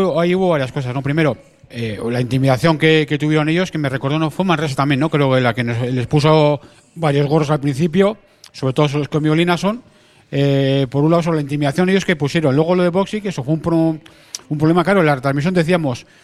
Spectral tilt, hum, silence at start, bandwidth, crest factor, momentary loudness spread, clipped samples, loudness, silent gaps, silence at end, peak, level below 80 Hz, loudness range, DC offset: -7 dB/octave; none; 0 s; 13 kHz; 16 dB; 9 LU; under 0.1%; -17 LUFS; none; 0.2 s; 0 dBFS; -48 dBFS; 1 LU; under 0.1%